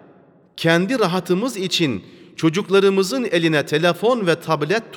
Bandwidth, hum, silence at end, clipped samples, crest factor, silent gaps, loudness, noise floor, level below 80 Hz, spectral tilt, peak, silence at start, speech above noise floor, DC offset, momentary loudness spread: 18.5 kHz; none; 0 s; under 0.1%; 18 dB; none; -19 LUFS; -51 dBFS; -68 dBFS; -5 dB/octave; -2 dBFS; 0.55 s; 32 dB; under 0.1%; 6 LU